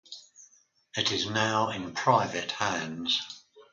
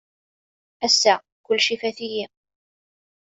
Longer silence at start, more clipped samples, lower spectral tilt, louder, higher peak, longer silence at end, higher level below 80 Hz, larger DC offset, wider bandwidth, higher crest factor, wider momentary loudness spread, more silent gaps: second, 0.1 s vs 0.8 s; neither; first, -3 dB/octave vs -0.5 dB/octave; second, -28 LUFS vs -21 LUFS; second, -8 dBFS vs -4 dBFS; second, 0.1 s vs 1 s; first, -64 dBFS vs -70 dBFS; neither; first, 9.6 kHz vs 8.2 kHz; about the same, 22 dB vs 22 dB; first, 17 LU vs 13 LU; second, none vs 1.32-1.44 s